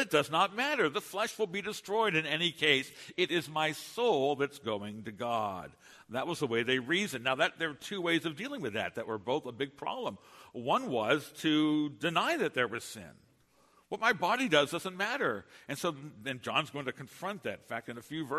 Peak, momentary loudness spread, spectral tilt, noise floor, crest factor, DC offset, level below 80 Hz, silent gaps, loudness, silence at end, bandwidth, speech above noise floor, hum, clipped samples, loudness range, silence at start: -10 dBFS; 12 LU; -4 dB/octave; -67 dBFS; 22 dB; under 0.1%; -74 dBFS; none; -32 LUFS; 0 s; 13.5 kHz; 34 dB; none; under 0.1%; 4 LU; 0 s